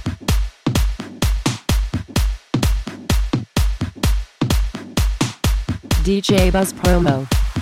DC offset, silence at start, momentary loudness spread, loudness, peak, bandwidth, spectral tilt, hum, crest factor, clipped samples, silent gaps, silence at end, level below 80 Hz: 0.2%; 0 s; 6 LU; -20 LUFS; -2 dBFS; 16.5 kHz; -5.5 dB/octave; none; 16 dB; under 0.1%; none; 0 s; -22 dBFS